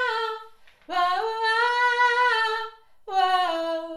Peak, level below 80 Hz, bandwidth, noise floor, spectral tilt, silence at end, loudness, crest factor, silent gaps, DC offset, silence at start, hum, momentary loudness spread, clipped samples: -10 dBFS; -70 dBFS; 13.5 kHz; -48 dBFS; -0.5 dB/octave; 0 s; -23 LUFS; 14 dB; none; under 0.1%; 0 s; none; 11 LU; under 0.1%